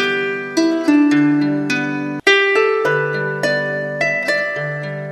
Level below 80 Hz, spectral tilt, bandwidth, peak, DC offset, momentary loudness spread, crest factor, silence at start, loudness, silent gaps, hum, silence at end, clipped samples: -64 dBFS; -5 dB/octave; 12.5 kHz; 0 dBFS; under 0.1%; 8 LU; 16 dB; 0 s; -16 LUFS; none; none; 0 s; under 0.1%